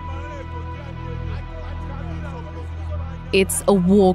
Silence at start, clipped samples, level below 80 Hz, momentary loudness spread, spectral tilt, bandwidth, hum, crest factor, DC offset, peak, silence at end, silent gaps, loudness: 0 s; under 0.1%; -34 dBFS; 15 LU; -5.5 dB/octave; 16 kHz; none; 18 dB; under 0.1%; -2 dBFS; 0 s; none; -24 LUFS